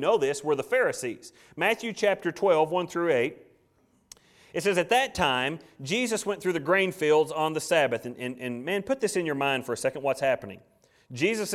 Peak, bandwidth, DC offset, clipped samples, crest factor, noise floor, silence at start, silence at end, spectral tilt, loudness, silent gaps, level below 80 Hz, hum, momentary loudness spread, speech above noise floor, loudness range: -8 dBFS; 15.5 kHz; under 0.1%; under 0.1%; 18 dB; -66 dBFS; 0 s; 0 s; -4 dB/octave; -27 LUFS; none; -62 dBFS; none; 10 LU; 39 dB; 3 LU